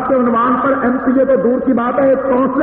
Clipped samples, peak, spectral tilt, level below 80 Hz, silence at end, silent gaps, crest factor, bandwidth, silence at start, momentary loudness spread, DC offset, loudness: under 0.1%; -4 dBFS; -6.5 dB/octave; -46 dBFS; 0 s; none; 10 dB; 3.7 kHz; 0 s; 2 LU; under 0.1%; -13 LUFS